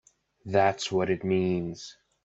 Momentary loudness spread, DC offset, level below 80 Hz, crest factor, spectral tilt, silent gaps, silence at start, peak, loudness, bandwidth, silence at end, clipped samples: 18 LU; under 0.1%; -64 dBFS; 18 dB; -5.5 dB/octave; none; 0.45 s; -10 dBFS; -27 LUFS; 8.2 kHz; 0.3 s; under 0.1%